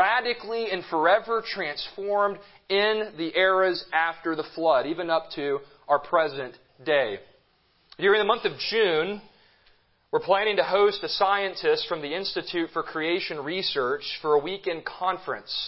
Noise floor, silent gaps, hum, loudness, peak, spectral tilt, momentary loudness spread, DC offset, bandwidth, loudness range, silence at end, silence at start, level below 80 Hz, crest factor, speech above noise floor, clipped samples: -65 dBFS; none; none; -25 LUFS; -8 dBFS; -7.5 dB/octave; 9 LU; under 0.1%; 5.8 kHz; 3 LU; 0 s; 0 s; -66 dBFS; 18 dB; 40 dB; under 0.1%